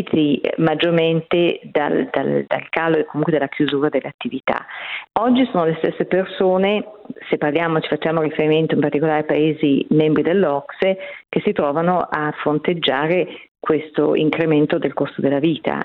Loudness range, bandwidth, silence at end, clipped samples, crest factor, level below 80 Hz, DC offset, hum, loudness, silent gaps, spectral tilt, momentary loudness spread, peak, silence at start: 2 LU; 4.5 kHz; 0 s; under 0.1%; 16 dB; -60 dBFS; under 0.1%; none; -19 LUFS; 4.14-4.19 s, 13.48-13.55 s; -9.5 dB/octave; 7 LU; -2 dBFS; 0 s